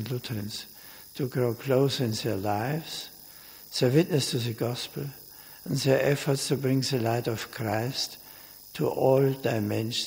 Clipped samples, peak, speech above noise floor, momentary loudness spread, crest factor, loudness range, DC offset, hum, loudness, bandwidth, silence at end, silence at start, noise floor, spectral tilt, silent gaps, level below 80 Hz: under 0.1%; -8 dBFS; 21 dB; 19 LU; 20 dB; 2 LU; under 0.1%; none; -28 LUFS; 16.5 kHz; 0 s; 0 s; -48 dBFS; -5.5 dB/octave; none; -64 dBFS